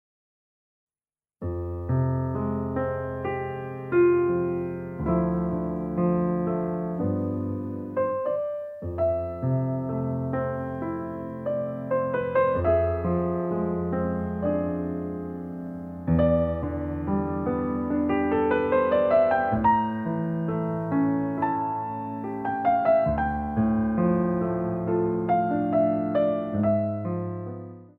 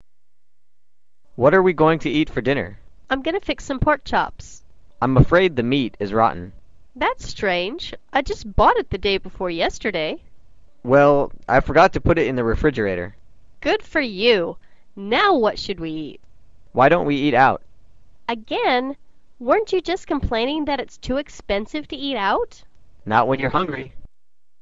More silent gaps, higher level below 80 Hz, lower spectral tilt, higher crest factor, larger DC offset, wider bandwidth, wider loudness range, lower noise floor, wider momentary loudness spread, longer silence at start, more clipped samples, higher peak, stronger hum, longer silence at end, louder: neither; second, -46 dBFS vs -36 dBFS; first, -11 dB/octave vs -6 dB/octave; about the same, 16 dB vs 18 dB; second, under 0.1% vs 0.8%; second, 4.3 kHz vs 7.8 kHz; about the same, 5 LU vs 5 LU; first, under -90 dBFS vs -80 dBFS; second, 10 LU vs 14 LU; about the same, 1.4 s vs 1.4 s; neither; second, -10 dBFS vs -2 dBFS; neither; second, 0.1 s vs 0.55 s; second, -26 LUFS vs -20 LUFS